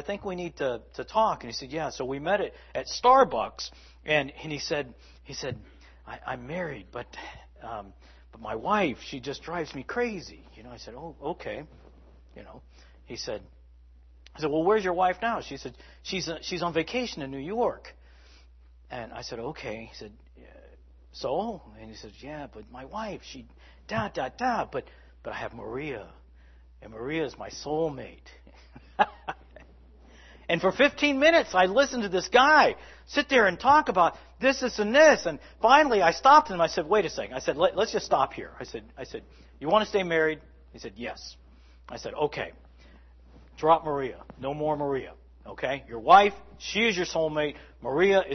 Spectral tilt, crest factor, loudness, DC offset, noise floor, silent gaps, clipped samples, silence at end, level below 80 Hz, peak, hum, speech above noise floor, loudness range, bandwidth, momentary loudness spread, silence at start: -4 dB/octave; 24 dB; -26 LUFS; under 0.1%; -53 dBFS; none; under 0.1%; 0 s; -54 dBFS; -4 dBFS; none; 27 dB; 16 LU; 6.4 kHz; 22 LU; 0 s